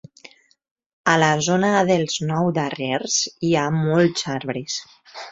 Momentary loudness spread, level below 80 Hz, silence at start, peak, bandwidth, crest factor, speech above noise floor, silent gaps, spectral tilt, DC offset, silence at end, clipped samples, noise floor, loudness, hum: 10 LU; -60 dBFS; 1.05 s; -2 dBFS; 7.8 kHz; 20 dB; 29 dB; none; -4.5 dB/octave; under 0.1%; 0 s; under 0.1%; -49 dBFS; -20 LUFS; none